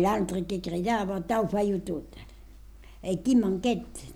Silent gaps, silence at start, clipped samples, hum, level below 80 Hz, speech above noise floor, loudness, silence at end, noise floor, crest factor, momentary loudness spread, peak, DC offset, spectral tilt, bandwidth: none; 0 s; under 0.1%; none; -48 dBFS; 21 dB; -28 LUFS; 0 s; -48 dBFS; 14 dB; 13 LU; -14 dBFS; under 0.1%; -6 dB/octave; 16 kHz